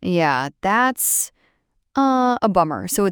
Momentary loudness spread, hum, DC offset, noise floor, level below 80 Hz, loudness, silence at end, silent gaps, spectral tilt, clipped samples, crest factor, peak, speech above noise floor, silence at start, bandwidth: 4 LU; none; under 0.1%; -66 dBFS; -52 dBFS; -19 LUFS; 0 s; none; -4 dB/octave; under 0.1%; 16 dB; -4 dBFS; 48 dB; 0 s; over 20 kHz